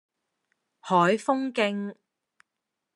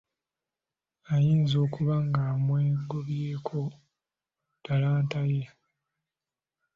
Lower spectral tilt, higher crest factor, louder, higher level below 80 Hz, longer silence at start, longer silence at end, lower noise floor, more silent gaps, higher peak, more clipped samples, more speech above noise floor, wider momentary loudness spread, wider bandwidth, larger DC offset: second, -5.5 dB/octave vs -8.5 dB/octave; about the same, 20 dB vs 16 dB; first, -25 LUFS vs -28 LUFS; second, -80 dBFS vs -62 dBFS; second, 0.85 s vs 1.1 s; second, 1 s vs 1.3 s; second, -85 dBFS vs under -90 dBFS; neither; first, -8 dBFS vs -14 dBFS; neither; second, 60 dB vs over 64 dB; first, 15 LU vs 9 LU; first, 11.5 kHz vs 6.8 kHz; neither